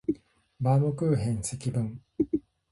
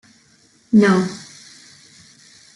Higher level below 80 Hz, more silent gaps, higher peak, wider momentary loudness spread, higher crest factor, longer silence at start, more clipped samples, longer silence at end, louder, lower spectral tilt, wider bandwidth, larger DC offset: first, -54 dBFS vs -62 dBFS; neither; second, -14 dBFS vs -4 dBFS; second, 9 LU vs 25 LU; about the same, 14 dB vs 18 dB; second, 0.1 s vs 0.7 s; neither; second, 0.35 s vs 1.35 s; second, -29 LUFS vs -16 LUFS; about the same, -7.5 dB/octave vs -6.5 dB/octave; about the same, 11.5 kHz vs 11.5 kHz; neither